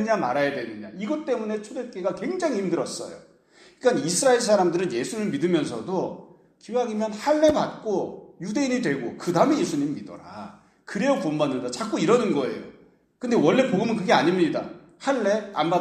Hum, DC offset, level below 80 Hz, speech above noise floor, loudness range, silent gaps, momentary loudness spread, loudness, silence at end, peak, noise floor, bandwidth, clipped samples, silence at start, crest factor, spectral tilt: none; under 0.1%; -64 dBFS; 31 dB; 4 LU; none; 15 LU; -24 LUFS; 0 s; -4 dBFS; -55 dBFS; 14.5 kHz; under 0.1%; 0 s; 20 dB; -5 dB/octave